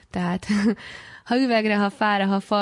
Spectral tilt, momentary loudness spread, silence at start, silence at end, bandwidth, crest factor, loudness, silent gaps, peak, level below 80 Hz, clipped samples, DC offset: -6 dB/octave; 11 LU; 0.15 s; 0 s; 11 kHz; 12 dB; -22 LUFS; none; -10 dBFS; -56 dBFS; under 0.1%; under 0.1%